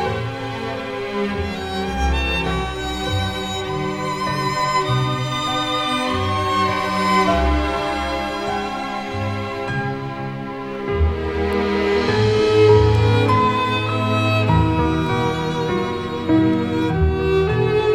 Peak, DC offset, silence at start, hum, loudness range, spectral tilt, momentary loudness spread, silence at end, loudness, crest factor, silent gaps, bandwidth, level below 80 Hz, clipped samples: -2 dBFS; under 0.1%; 0 s; none; 7 LU; -6 dB/octave; 9 LU; 0 s; -20 LUFS; 18 dB; none; 14 kHz; -32 dBFS; under 0.1%